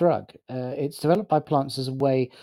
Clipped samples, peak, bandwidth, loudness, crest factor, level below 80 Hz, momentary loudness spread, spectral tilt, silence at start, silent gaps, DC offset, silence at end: under 0.1%; -8 dBFS; 16 kHz; -25 LUFS; 16 dB; -66 dBFS; 9 LU; -7 dB/octave; 0 s; none; under 0.1%; 0.15 s